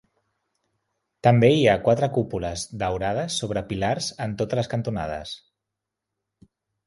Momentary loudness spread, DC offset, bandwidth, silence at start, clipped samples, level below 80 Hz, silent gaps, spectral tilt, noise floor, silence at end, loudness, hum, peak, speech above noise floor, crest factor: 13 LU; under 0.1%; 11.5 kHz; 1.25 s; under 0.1%; -48 dBFS; none; -5.5 dB/octave; -84 dBFS; 1.5 s; -23 LUFS; none; -2 dBFS; 62 dB; 22 dB